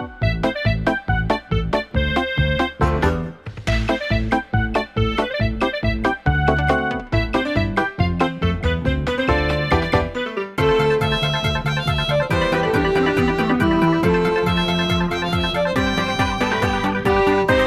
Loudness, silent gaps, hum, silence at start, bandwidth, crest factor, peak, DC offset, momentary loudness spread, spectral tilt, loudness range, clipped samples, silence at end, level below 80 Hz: -20 LUFS; none; none; 0 s; 15 kHz; 18 dB; -2 dBFS; under 0.1%; 4 LU; -6.5 dB/octave; 3 LU; under 0.1%; 0 s; -30 dBFS